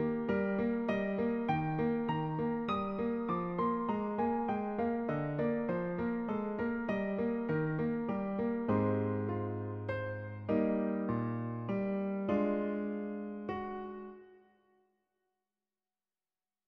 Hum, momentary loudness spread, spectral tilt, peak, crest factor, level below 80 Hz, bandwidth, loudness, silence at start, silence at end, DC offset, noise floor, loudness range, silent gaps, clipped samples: none; 7 LU; -7.5 dB/octave; -18 dBFS; 18 dB; -62 dBFS; 5.4 kHz; -35 LUFS; 0 s; 2.3 s; under 0.1%; under -90 dBFS; 5 LU; none; under 0.1%